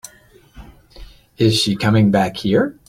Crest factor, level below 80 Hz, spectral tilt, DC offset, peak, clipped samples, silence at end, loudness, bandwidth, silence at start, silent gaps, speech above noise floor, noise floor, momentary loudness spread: 16 dB; -44 dBFS; -5.5 dB/octave; under 0.1%; -2 dBFS; under 0.1%; 0.15 s; -16 LUFS; 15.5 kHz; 0.55 s; none; 33 dB; -49 dBFS; 4 LU